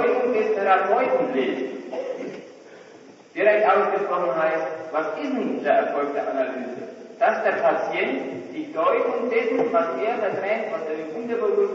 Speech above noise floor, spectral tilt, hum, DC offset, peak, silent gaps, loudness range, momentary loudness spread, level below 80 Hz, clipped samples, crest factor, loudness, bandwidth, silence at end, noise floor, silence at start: 24 dB; -6 dB/octave; none; under 0.1%; -6 dBFS; none; 2 LU; 12 LU; -82 dBFS; under 0.1%; 16 dB; -23 LUFS; 7.4 kHz; 0 s; -47 dBFS; 0 s